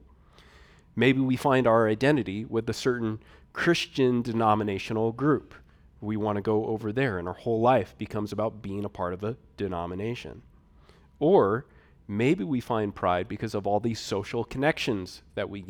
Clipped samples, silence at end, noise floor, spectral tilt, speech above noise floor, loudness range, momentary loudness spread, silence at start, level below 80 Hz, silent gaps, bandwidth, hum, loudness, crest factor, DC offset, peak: under 0.1%; 0 s; -56 dBFS; -6.5 dB/octave; 30 dB; 4 LU; 12 LU; 0.95 s; -56 dBFS; none; 17 kHz; none; -27 LUFS; 20 dB; under 0.1%; -8 dBFS